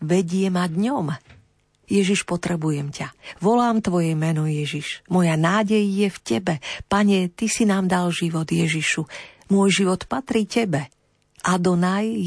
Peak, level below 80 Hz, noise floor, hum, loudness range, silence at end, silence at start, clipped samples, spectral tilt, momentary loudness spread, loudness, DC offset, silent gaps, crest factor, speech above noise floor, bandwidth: -6 dBFS; -54 dBFS; -59 dBFS; none; 2 LU; 0 s; 0 s; under 0.1%; -5.5 dB/octave; 9 LU; -21 LUFS; under 0.1%; none; 16 dB; 38 dB; 11 kHz